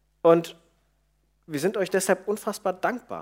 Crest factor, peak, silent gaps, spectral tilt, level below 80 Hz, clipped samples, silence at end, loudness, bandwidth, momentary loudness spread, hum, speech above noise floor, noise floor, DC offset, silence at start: 20 dB; -6 dBFS; none; -5 dB/octave; -68 dBFS; under 0.1%; 0 s; -25 LUFS; 16 kHz; 9 LU; none; 44 dB; -68 dBFS; under 0.1%; 0.25 s